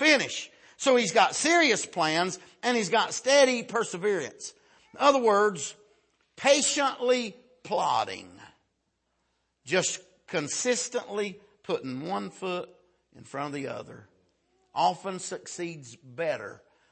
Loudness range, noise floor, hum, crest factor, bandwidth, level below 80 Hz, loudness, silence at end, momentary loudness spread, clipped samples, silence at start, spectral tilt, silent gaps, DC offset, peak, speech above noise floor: 10 LU; -77 dBFS; none; 20 dB; 8.8 kHz; -76 dBFS; -27 LUFS; 0.35 s; 16 LU; under 0.1%; 0 s; -2.5 dB/octave; none; under 0.1%; -8 dBFS; 50 dB